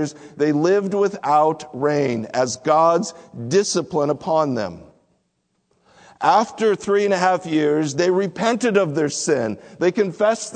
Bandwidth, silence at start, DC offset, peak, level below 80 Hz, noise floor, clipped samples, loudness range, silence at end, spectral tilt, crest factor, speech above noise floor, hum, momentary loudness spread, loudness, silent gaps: 9.4 kHz; 0 s; under 0.1%; -2 dBFS; -64 dBFS; -70 dBFS; under 0.1%; 3 LU; 0 s; -5 dB/octave; 18 dB; 51 dB; none; 5 LU; -20 LUFS; none